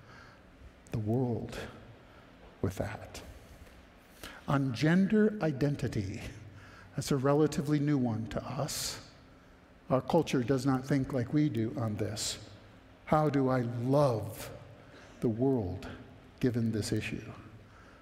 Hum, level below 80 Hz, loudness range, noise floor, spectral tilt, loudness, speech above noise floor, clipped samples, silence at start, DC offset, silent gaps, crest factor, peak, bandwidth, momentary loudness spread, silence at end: none; -56 dBFS; 7 LU; -58 dBFS; -6.5 dB/octave; -32 LUFS; 27 dB; under 0.1%; 0.05 s; under 0.1%; none; 22 dB; -10 dBFS; 16 kHz; 22 LU; 0.05 s